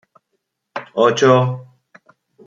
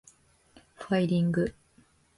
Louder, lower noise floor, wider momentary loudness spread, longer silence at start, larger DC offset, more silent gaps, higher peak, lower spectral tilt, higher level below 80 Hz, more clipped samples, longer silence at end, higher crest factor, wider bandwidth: first, -15 LUFS vs -28 LUFS; first, -73 dBFS vs -63 dBFS; first, 19 LU vs 9 LU; about the same, 0.75 s vs 0.8 s; neither; neither; first, -2 dBFS vs -14 dBFS; second, -6 dB/octave vs -7.5 dB/octave; second, -64 dBFS vs -58 dBFS; neither; first, 0.85 s vs 0.65 s; about the same, 18 dB vs 16 dB; second, 7.6 kHz vs 11.5 kHz